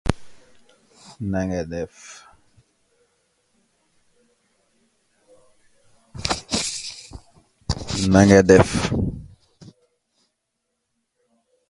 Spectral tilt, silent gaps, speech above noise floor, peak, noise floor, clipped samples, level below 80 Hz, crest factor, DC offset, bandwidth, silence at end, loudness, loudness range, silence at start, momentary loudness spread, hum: -5.5 dB/octave; none; 60 dB; 0 dBFS; -77 dBFS; under 0.1%; -40 dBFS; 24 dB; under 0.1%; 11.5 kHz; 2.45 s; -20 LUFS; 15 LU; 0.05 s; 27 LU; none